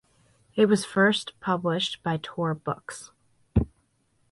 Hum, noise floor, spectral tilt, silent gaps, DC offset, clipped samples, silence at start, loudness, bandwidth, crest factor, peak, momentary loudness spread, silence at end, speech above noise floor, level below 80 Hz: none; -69 dBFS; -5.5 dB/octave; none; under 0.1%; under 0.1%; 0.55 s; -26 LUFS; 11.5 kHz; 20 dB; -8 dBFS; 13 LU; 0.65 s; 43 dB; -42 dBFS